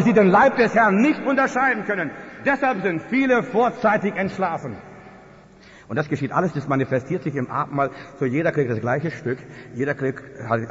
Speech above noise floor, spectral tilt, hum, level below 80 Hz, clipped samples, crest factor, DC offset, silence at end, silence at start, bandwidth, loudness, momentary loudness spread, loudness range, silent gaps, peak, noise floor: 26 dB; -7.5 dB/octave; none; -58 dBFS; under 0.1%; 14 dB; under 0.1%; 0 s; 0 s; 8 kHz; -21 LUFS; 12 LU; 6 LU; none; -6 dBFS; -47 dBFS